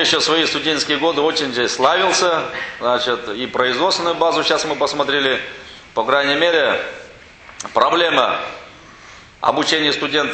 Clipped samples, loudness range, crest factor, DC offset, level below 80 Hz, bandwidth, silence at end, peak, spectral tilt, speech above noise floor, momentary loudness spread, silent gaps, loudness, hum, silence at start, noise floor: under 0.1%; 2 LU; 18 dB; under 0.1%; -54 dBFS; 9 kHz; 0 s; 0 dBFS; -2 dB/octave; 24 dB; 10 LU; none; -17 LUFS; none; 0 s; -41 dBFS